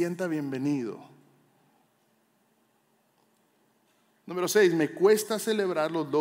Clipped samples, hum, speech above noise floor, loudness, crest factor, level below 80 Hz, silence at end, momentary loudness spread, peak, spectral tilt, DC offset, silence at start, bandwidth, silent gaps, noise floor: under 0.1%; none; 43 dB; -27 LUFS; 20 dB; under -90 dBFS; 0 s; 11 LU; -10 dBFS; -4.5 dB/octave; under 0.1%; 0 s; 16 kHz; none; -69 dBFS